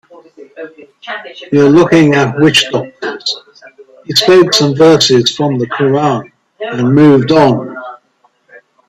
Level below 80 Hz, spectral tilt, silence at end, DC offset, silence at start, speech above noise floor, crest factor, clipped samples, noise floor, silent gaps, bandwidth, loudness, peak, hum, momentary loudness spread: -50 dBFS; -5 dB/octave; 0.95 s; under 0.1%; 0.4 s; 46 dB; 12 dB; under 0.1%; -55 dBFS; none; 14.5 kHz; -9 LUFS; 0 dBFS; none; 18 LU